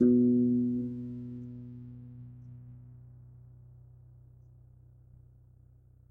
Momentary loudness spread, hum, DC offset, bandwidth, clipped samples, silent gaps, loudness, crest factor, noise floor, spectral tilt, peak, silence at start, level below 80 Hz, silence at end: 29 LU; 60 Hz at -65 dBFS; under 0.1%; 1.6 kHz; under 0.1%; none; -30 LUFS; 18 dB; -59 dBFS; -13 dB/octave; -14 dBFS; 0 s; -62 dBFS; 3.15 s